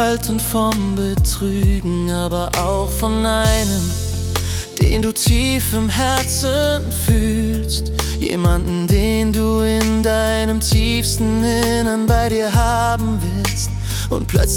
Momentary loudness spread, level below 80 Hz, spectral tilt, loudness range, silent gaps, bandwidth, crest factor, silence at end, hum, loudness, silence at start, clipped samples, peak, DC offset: 5 LU; -24 dBFS; -5 dB/octave; 2 LU; none; 18 kHz; 14 dB; 0 s; none; -18 LUFS; 0 s; under 0.1%; -2 dBFS; under 0.1%